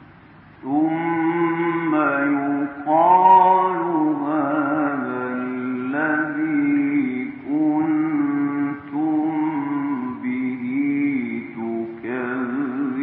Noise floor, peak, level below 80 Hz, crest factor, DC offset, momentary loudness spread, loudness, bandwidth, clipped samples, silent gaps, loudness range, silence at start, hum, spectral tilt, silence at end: -46 dBFS; -4 dBFS; -68 dBFS; 18 dB; under 0.1%; 9 LU; -21 LUFS; 3.9 kHz; under 0.1%; none; 6 LU; 0 s; none; -11.5 dB/octave; 0 s